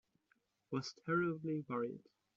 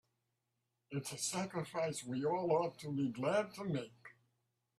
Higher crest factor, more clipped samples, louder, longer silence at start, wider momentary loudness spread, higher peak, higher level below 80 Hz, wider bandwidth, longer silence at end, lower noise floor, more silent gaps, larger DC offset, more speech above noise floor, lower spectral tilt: about the same, 18 dB vs 18 dB; neither; about the same, -40 LUFS vs -39 LUFS; second, 0.7 s vs 0.9 s; about the same, 8 LU vs 8 LU; about the same, -24 dBFS vs -22 dBFS; about the same, -82 dBFS vs -80 dBFS; second, 7.6 kHz vs 15 kHz; second, 0.35 s vs 0.7 s; second, -80 dBFS vs -86 dBFS; neither; neither; second, 40 dB vs 48 dB; about the same, -5.5 dB/octave vs -5 dB/octave